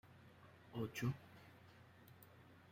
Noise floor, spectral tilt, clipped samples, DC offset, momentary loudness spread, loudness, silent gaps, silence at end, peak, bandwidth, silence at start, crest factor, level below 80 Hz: -64 dBFS; -6 dB/octave; under 0.1%; under 0.1%; 21 LU; -47 LUFS; none; 0 s; -30 dBFS; 16 kHz; 0.05 s; 22 dB; -76 dBFS